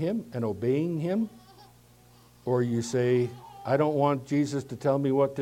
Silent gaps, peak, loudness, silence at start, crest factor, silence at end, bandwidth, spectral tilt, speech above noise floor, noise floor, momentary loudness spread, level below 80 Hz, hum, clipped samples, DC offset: none; -10 dBFS; -28 LUFS; 0 s; 18 dB; 0 s; 16 kHz; -7 dB/octave; 30 dB; -56 dBFS; 7 LU; -66 dBFS; 60 Hz at -50 dBFS; under 0.1%; under 0.1%